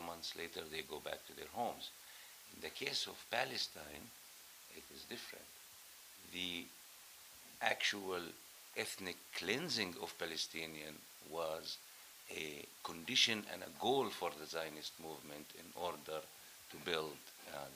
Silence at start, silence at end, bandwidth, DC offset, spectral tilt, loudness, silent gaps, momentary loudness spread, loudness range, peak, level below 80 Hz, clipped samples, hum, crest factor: 0 s; 0 s; over 20 kHz; under 0.1%; -2 dB/octave; -42 LUFS; none; 18 LU; 7 LU; -18 dBFS; -78 dBFS; under 0.1%; none; 28 dB